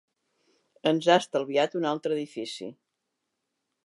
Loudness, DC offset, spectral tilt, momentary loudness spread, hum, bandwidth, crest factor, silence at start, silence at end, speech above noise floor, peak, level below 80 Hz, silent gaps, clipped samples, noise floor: -27 LUFS; under 0.1%; -4.5 dB/octave; 14 LU; none; 11.5 kHz; 22 dB; 0.85 s; 1.1 s; 56 dB; -8 dBFS; -86 dBFS; none; under 0.1%; -82 dBFS